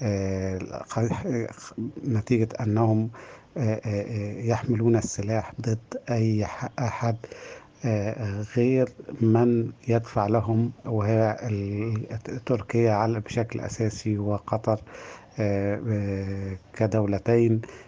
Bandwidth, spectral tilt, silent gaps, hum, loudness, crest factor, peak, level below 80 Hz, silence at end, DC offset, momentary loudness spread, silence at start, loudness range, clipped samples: 7.6 kHz; -7.5 dB/octave; none; none; -26 LUFS; 18 dB; -8 dBFS; -58 dBFS; 0.05 s; under 0.1%; 10 LU; 0 s; 4 LU; under 0.1%